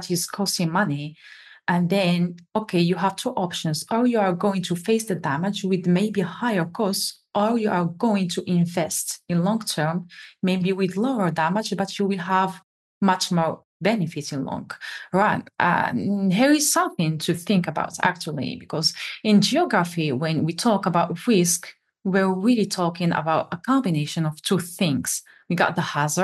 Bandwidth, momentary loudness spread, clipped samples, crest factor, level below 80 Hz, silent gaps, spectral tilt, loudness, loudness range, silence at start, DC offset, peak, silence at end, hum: 12.5 kHz; 7 LU; under 0.1%; 20 dB; -70 dBFS; 12.64-13.01 s, 13.64-13.80 s; -4.5 dB/octave; -23 LUFS; 3 LU; 0 s; under 0.1%; -2 dBFS; 0 s; none